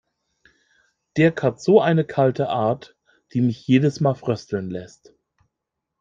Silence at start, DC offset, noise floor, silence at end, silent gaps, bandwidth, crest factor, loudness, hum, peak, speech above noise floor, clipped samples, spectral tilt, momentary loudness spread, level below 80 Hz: 1.15 s; under 0.1%; -82 dBFS; 1.15 s; none; 7.6 kHz; 20 dB; -21 LUFS; none; -2 dBFS; 62 dB; under 0.1%; -7.5 dB/octave; 12 LU; -62 dBFS